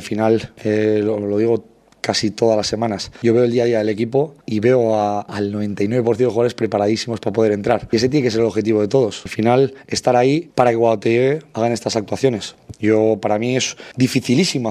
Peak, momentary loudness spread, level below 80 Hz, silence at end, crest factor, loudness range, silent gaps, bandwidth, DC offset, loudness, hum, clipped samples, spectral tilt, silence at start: 0 dBFS; 6 LU; -54 dBFS; 0 s; 18 dB; 2 LU; none; 15 kHz; under 0.1%; -18 LUFS; none; under 0.1%; -5.5 dB/octave; 0 s